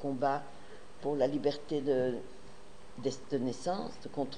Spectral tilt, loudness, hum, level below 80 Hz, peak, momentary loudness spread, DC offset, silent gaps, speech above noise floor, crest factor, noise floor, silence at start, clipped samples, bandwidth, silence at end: -6 dB/octave; -35 LUFS; none; -64 dBFS; -18 dBFS; 22 LU; 0.7%; none; 20 dB; 18 dB; -54 dBFS; 0 s; under 0.1%; 10.5 kHz; 0 s